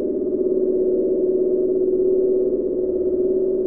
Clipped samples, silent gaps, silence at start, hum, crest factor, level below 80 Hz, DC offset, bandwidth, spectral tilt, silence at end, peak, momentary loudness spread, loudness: under 0.1%; none; 0 s; none; 10 dB; -48 dBFS; 0.6%; 1.3 kHz; -14.5 dB/octave; 0 s; -10 dBFS; 3 LU; -20 LUFS